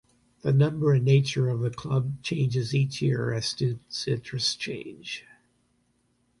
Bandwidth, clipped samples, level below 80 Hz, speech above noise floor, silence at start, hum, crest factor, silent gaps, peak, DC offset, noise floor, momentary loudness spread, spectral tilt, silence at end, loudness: 11.5 kHz; under 0.1%; -60 dBFS; 44 dB; 0.45 s; none; 18 dB; none; -8 dBFS; under 0.1%; -70 dBFS; 12 LU; -6 dB/octave; 1.2 s; -26 LUFS